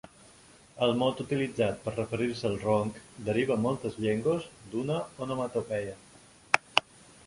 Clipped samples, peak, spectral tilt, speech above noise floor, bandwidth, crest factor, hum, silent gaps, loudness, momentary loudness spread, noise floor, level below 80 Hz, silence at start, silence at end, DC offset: under 0.1%; 0 dBFS; -5.5 dB/octave; 26 dB; 11.5 kHz; 30 dB; none; none; -30 LUFS; 8 LU; -56 dBFS; -60 dBFS; 0.75 s; 0.45 s; under 0.1%